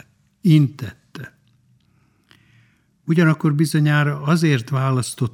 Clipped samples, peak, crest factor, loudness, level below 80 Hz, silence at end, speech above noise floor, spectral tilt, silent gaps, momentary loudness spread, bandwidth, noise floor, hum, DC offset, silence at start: under 0.1%; -2 dBFS; 18 dB; -18 LUFS; -64 dBFS; 0.05 s; 43 dB; -6.5 dB/octave; none; 21 LU; 14 kHz; -60 dBFS; none; under 0.1%; 0.45 s